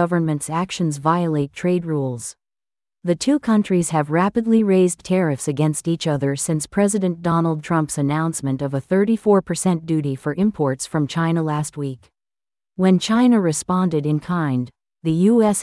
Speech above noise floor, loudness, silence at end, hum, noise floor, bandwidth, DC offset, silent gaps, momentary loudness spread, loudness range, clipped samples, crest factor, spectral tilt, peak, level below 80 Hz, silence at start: over 71 dB; -20 LUFS; 0 s; none; under -90 dBFS; 12 kHz; under 0.1%; none; 8 LU; 3 LU; under 0.1%; 16 dB; -6 dB/octave; -4 dBFS; -56 dBFS; 0 s